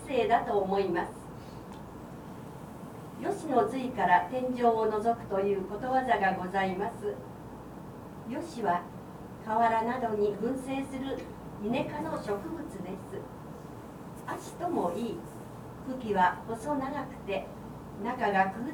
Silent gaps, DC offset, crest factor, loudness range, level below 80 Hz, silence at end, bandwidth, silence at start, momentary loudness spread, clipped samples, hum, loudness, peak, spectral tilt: none; under 0.1%; 22 dB; 8 LU; -58 dBFS; 0 s; over 20 kHz; 0 s; 18 LU; under 0.1%; none; -31 LUFS; -10 dBFS; -6 dB/octave